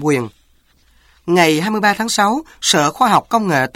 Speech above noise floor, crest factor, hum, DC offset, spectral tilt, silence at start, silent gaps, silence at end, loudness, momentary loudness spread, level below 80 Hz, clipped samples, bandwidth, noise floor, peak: 39 dB; 16 dB; none; under 0.1%; -3.5 dB/octave; 0 s; none; 0.05 s; -15 LUFS; 6 LU; -54 dBFS; under 0.1%; 16.5 kHz; -54 dBFS; -2 dBFS